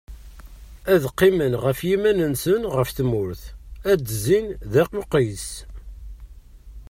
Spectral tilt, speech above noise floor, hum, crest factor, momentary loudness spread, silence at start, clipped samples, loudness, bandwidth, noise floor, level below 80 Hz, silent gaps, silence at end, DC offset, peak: -6 dB/octave; 22 dB; none; 18 dB; 19 LU; 0.1 s; under 0.1%; -21 LUFS; 16 kHz; -43 dBFS; -40 dBFS; none; 0.05 s; under 0.1%; -6 dBFS